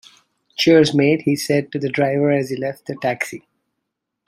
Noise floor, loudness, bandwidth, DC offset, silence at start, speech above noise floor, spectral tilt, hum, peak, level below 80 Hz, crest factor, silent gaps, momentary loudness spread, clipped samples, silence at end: -78 dBFS; -18 LUFS; 16 kHz; under 0.1%; 0.6 s; 61 dB; -5.5 dB/octave; none; -2 dBFS; -60 dBFS; 18 dB; none; 13 LU; under 0.1%; 0.9 s